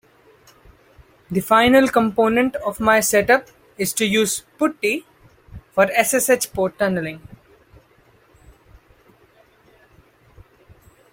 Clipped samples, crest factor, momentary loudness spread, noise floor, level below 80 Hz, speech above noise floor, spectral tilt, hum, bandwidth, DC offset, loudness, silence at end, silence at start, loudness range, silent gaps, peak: under 0.1%; 20 dB; 11 LU; -55 dBFS; -52 dBFS; 37 dB; -3.5 dB/octave; none; 16.5 kHz; under 0.1%; -18 LUFS; 3.95 s; 1.3 s; 8 LU; none; -2 dBFS